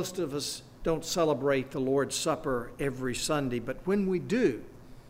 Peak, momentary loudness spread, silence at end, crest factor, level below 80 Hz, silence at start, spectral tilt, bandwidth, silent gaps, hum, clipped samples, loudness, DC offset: -14 dBFS; 7 LU; 0 s; 16 dB; -50 dBFS; 0 s; -4.5 dB/octave; 16 kHz; none; none; under 0.1%; -30 LUFS; under 0.1%